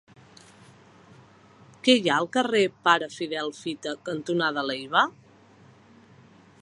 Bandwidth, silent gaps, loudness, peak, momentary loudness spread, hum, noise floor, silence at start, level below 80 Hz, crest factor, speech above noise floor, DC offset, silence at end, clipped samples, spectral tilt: 11 kHz; none; -25 LUFS; -4 dBFS; 11 LU; none; -54 dBFS; 1.85 s; -74 dBFS; 24 dB; 29 dB; under 0.1%; 1.5 s; under 0.1%; -4 dB/octave